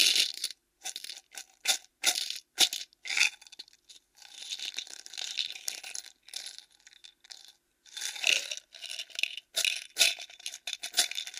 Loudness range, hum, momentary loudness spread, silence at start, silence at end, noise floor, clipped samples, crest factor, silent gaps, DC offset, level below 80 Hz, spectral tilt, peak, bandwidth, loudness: 8 LU; none; 20 LU; 0 s; 0 s; -59 dBFS; under 0.1%; 30 dB; none; under 0.1%; -84 dBFS; 3.5 dB/octave; -4 dBFS; 16 kHz; -30 LUFS